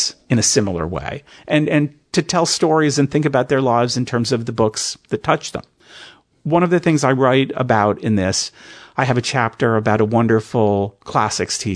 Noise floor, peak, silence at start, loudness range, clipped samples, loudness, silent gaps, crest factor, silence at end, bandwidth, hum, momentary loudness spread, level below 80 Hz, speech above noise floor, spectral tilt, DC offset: -43 dBFS; 0 dBFS; 0 s; 2 LU; under 0.1%; -17 LUFS; none; 18 dB; 0 s; 11 kHz; none; 8 LU; -50 dBFS; 26 dB; -4.5 dB/octave; under 0.1%